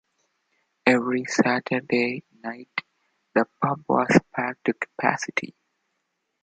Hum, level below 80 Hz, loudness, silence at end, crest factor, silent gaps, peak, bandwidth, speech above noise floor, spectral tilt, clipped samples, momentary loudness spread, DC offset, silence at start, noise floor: none; -64 dBFS; -24 LUFS; 0.95 s; 24 dB; none; -2 dBFS; 9.2 kHz; 53 dB; -5.5 dB/octave; under 0.1%; 12 LU; under 0.1%; 0.85 s; -77 dBFS